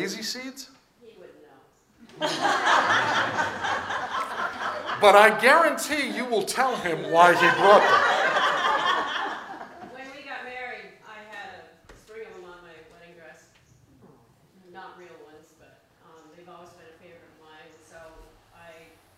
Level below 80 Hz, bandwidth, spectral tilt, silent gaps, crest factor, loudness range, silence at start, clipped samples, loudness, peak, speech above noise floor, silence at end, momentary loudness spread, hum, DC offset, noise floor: -66 dBFS; 16 kHz; -3 dB/octave; none; 24 dB; 21 LU; 0 s; under 0.1%; -21 LUFS; -2 dBFS; 38 dB; 0.45 s; 25 LU; none; under 0.1%; -58 dBFS